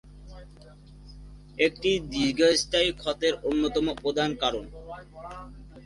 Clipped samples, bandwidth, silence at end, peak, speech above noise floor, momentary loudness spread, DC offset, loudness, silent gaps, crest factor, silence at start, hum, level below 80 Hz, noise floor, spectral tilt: under 0.1%; 11.5 kHz; 0 s; -8 dBFS; 23 dB; 21 LU; under 0.1%; -26 LUFS; none; 20 dB; 0.05 s; 50 Hz at -50 dBFS; -48 dBFS; -49 dBFS; -3.5 dB/octave